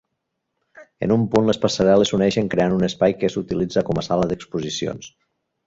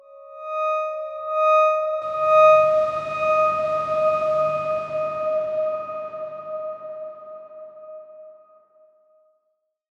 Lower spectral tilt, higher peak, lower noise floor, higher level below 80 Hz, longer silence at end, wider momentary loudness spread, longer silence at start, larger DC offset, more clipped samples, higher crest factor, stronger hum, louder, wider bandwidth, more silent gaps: about the same, -6 dB/octave vs -5 dB/octave; about the same, -4 dBFS vs -6 dBFS; about the same, -77 dBFS vs -74 dBFS; first, -50 dBFS vs -64 dBFS; second, 0.6 s vs 1.65 s; second, 10 LU vs 23 LU; first, 0.75 s vs 0.1 s; neither; neither; about the same, 18 dB vs 16 dB; neither; about the same, -20 LUFS vs -21 LUFS; about the same, 7.8 kHz vs 7.2 kHz; neither